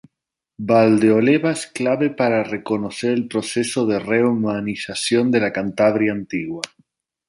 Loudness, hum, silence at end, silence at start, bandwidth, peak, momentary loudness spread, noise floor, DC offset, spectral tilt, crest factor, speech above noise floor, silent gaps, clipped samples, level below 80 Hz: -19 LUFS; none; 0.6 s; 0.6 s; 11.5 kHz; -2 dBFS; 11 LU; -83 dBFS; under 0.1%; -5.5 dB/octave; 16 dB; 64 dB; none; under 0.1%; -60 dBFS